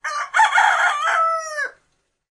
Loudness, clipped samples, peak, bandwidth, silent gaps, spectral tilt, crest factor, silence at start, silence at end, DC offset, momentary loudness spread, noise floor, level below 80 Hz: -18 LUFS; under 0.1%; -2 dBFS; 11.5 kHz; none; 3.5 dB/octave; 16 dB; 0.05 s; 0.6 s; under 0.1%; 12 LU; -68 dBFS; -72 dBFS